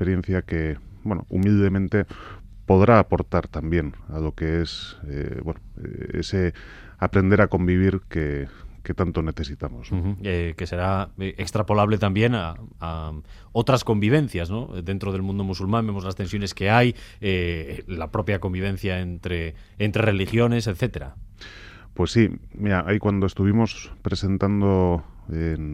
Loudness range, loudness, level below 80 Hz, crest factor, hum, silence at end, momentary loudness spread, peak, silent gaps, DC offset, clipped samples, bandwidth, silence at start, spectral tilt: 5 LU; -24 LUFS; -40 dBFS; 20 dB; none; 0 s; 14 LU; -2 dBFS; none; under 0.1%; under 0.1%; 12.5 kHz; 0 s; -7 dB/octave